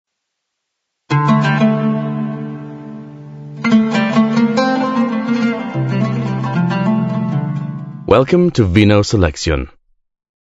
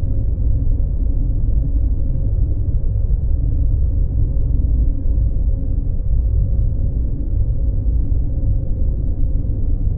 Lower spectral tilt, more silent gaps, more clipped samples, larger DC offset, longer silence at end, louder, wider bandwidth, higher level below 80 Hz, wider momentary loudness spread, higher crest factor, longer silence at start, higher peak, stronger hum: second, -7 dB/octave vs -16 dB/octave; neither; neither; neither; first, 0.85 s vs 0 s; first, -15 LUFS vs -21 LUFS; first, 7.8 kHz vs 1.1 kHz; second, -36 dBFS vs -16 dBFS; first, 16 LU vs 3 LU; about the same, 16 dB vs 12 dB; first, 1.1 s vs 0 s; first, 0 dBFS vs -4 dBFS; neither